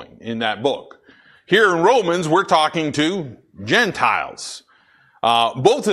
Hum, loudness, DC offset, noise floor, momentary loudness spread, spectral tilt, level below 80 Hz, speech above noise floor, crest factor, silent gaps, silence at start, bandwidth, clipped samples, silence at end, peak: none; -18 LUFS; under 0.1%; -55 dBFS; 15 LU; -4 dB/octave; -60 dBFS; 37 dB; 18 dB; none; 0 s; 13.5 kHz; under 0.1%; 0 s; -2 dBFS